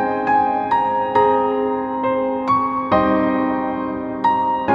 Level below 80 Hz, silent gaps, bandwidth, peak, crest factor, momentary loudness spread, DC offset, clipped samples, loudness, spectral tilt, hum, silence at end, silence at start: -48 dBFS; none; 6.2 kHz; -2 dBFS; 16 dB; 5 LU; under 0.1%; under 0.1%; -18 LUFS; -8 dB/octave; none; 0 s; 0 s